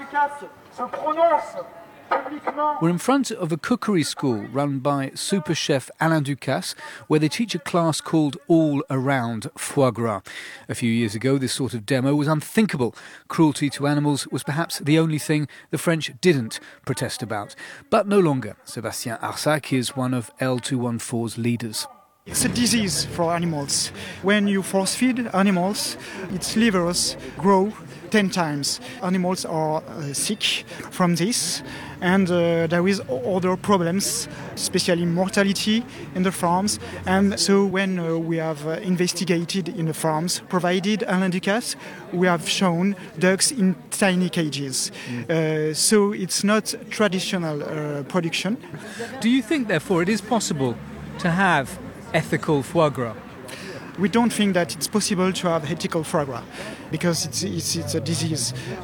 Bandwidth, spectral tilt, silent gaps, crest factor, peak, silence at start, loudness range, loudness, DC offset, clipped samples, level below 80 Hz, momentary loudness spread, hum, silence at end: 19 kHz; -4.5 dB/octave; none; 18 dB; -4 dBFS; 0 s; 2 LU; -22 LUFS; under 0.1%; under 0.1%; -56 dBFS; 10 LU; none; 0 s